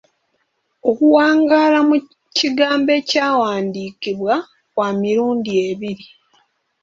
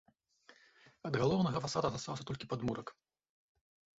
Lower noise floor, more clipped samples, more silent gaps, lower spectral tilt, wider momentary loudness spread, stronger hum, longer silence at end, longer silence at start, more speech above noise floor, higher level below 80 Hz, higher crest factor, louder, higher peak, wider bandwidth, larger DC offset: about the same, -68 dBFS vs -66 dBFS; neither; neither; about the same, -4.5 dB/octave vs -5.5 dB/octave; about the same, 12 LU vs 12 LU; neither; second, 0.75 s vs 1.05 s; first, 0.85 s vs 0.5 s; first, 52 dB vs 30 dB; about the same, -64 dBFS vs -64 dBFS; about the same, 16 dB vs 20 dB; first, -17 LUFS vs -36 LUFS; first, -2 dBFS vs -20 dBFS; about the same, 7.6 kHz vs 8 kHz; neither